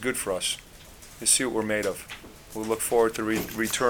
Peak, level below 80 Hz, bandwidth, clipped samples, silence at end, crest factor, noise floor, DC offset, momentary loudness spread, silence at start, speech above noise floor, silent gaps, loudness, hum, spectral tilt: -6 dBFS; -52 dBFS; 19.5 kHz; under 0.1%; 0 s; 20 dB; -47 dBFS; under 0.1%; 19 LU; 0 s; 21 dB; none; -26 LUFS; none; -2 dB/octave